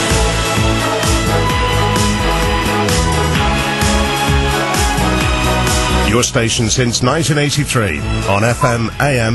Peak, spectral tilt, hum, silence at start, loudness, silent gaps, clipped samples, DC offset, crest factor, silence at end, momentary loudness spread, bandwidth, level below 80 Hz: 0 dBFS; -4 dB/octave; none; 0 s; -14 LUFS; none; under 0.1%; under 0.1%; 12 dB; 0 s; 2 LU; 12.5 kHz; -22 dBFS